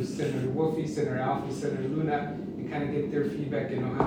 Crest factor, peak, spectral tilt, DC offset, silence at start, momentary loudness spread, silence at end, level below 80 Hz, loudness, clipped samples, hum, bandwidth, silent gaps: 18 dB; -12 dBFS; -7.5 dB/octave; under 0.1%; 0 s; 4 LU; 0 s; -58 dBFS; -30 LUFS; under 0.1%; none; 15.5 kHz; none